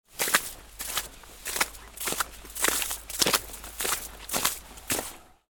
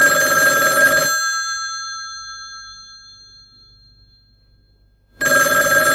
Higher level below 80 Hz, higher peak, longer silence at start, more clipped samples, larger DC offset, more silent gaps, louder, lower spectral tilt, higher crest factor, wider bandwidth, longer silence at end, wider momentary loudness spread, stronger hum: about the same, -50 dBFS vs -52 dBFS; about the same, -4 dBFS vs -2 dBFS; about the same, 0.1 s vs 0 s; neither; neither; neither; second, -28 LUFS vs -15 LUFS; about the same, -0.5 dB/octave vs -0.5 dB/octave; first, 28 dB vs 18 dB; first, 19 kHz vs 17 kHz; first, 0.2 s vs 0 s; second, 14 LU vs 20 LU; neither